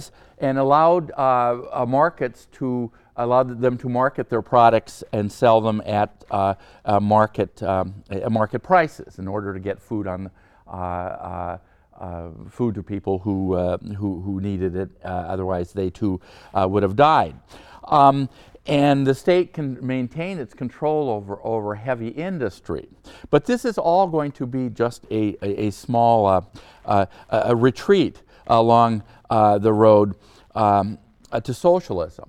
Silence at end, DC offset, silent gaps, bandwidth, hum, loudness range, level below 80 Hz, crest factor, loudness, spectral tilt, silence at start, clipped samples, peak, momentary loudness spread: 0.05 s; under 0.1%; none; 13.5 kHz; none; 8 LU; -52 dBFS; 20 dB; -21 LUFS; -7.5 dB/octave; 0 s; under 0.1%; 0 dBFS; 14 LU